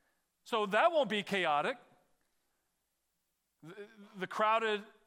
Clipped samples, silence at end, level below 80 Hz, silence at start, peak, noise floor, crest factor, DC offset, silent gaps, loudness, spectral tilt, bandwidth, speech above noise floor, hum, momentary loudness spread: under 0.1%; 0.2 s; -88 dBFS; 0.45 s; -16 dBFS; -83 dBFS; 20 dB; under 0.1%; none; -32 LUFS; -4.5 dB/octave; 16 kHz; 50 dB; none; 22 LU